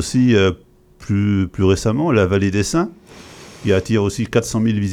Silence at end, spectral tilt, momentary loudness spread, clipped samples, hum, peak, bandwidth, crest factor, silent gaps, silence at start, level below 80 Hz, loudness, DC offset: 0 s; -6 dB/octave; 11 LU; under 0.1%; none; -2 dBFS; 14.5 kHz; 16 dB; none; 0 s; -42 dBFS; -18 LUFS; under 0.1%